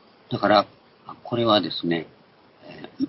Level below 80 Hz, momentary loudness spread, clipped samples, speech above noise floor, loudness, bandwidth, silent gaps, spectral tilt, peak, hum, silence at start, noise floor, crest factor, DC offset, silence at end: -62 dBFS; 23 LU; under 0.1%; 31 dB; -23 LUFS; 5.8 kHz; none; -9 dB/octave; -4 dBFS; none; 0.3 s; -54 dBFS; 20 dB; under 0.1%; 0 s